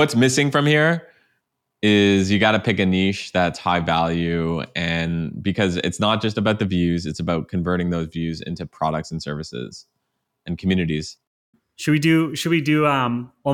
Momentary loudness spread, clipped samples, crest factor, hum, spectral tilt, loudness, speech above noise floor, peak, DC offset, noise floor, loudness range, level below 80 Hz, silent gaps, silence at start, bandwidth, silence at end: 11 LU; under 0.1%; 18 dB; none; -5.5 dB/octave; -20 LUFS; 55 dB; -4 dBFS; under 0.1%; -75 dBFS; 8 LU; -52 dBFS; 11.27-11.53 s; 0 s; 16 kHz; 0 s